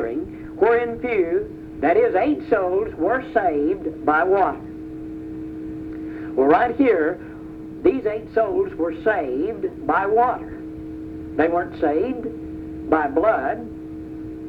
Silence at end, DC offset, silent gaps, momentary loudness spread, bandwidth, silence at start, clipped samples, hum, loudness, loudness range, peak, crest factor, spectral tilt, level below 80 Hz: 0 s; under 0.1%; none; 16 LU; 5.2 kHz; 0 s; under 0.1%; none; -21 LUFS; 3 LU; -4 dBFS; 18 dB; -8.5 dB/octave; -48 dBFS